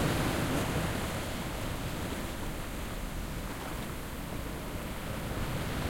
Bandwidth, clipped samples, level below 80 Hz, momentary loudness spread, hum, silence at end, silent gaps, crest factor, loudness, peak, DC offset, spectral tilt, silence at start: 16.5 kHz; under 0.1%; -42 dBFS; 8 LU; none; 0 s; none; 18 dB; -36 LUFS; -18 dBFS; under 0.1%; -5 dB/octave; 0 s